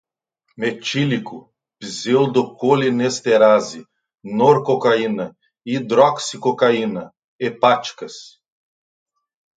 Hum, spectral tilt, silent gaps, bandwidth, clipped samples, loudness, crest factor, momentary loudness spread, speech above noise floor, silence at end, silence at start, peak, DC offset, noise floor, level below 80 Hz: none; -5 dB/octave; 7.24-7.39 s; 9.4 kHz; under 0.1%; -18 LUFS; 18 dB; 17 LU; 53 dB; 1.3 s; 0.6 s; 0 dBFS; under 0.1%; -70 dBFS; -68 dBFS